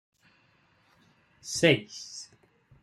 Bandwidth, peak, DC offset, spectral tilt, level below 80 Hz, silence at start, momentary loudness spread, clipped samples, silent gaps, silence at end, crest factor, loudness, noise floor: 13.5 kHz; -8 dBFS; under 0.1%; -4 dB/octave; -68 dBFS; 1.45 s; 22 LU; under 0.1%; none; 0.6 s; 24 dB; -27 LUFS; -66 dBFS